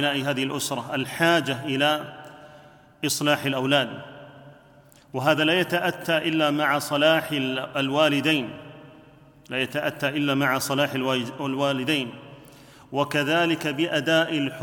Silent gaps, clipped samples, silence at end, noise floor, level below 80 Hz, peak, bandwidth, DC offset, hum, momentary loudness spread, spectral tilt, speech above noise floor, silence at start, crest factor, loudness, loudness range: none; under 0.1%; 0 s; -53 dBFS; -66 dBFS; -6 dBFS; 19 kHz; under 0.1%; none; 11 LU; -4 dB/octave; 29 dB; 0 s; 20 dB; -23 LUFS; 3 LU